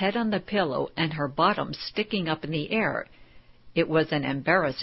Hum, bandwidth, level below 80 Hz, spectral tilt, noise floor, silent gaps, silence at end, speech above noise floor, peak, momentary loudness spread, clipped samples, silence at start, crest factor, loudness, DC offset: none; 5.8 kHz; -56 dBFS; -9.5 dB/octave; -51 dBFS; none; 0 s; 24 dB; -8 dBFS; 6 LU; under 0.1%; 0 s; 20 dB; -27 LUFS; under 0.1%